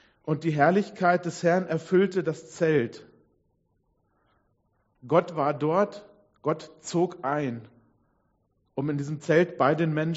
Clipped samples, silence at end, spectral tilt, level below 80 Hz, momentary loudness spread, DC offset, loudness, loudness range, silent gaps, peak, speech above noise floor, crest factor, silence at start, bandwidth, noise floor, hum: under 0.1%; 0 s; -6 dB/octave; -70 dBFS; 10 LU; under 0.1%; -26 LUFS; 6 LU; none; -6 dBFS; 46 dB; 22 dB; 0.25 s; 8 kHz; -71 dBFS; none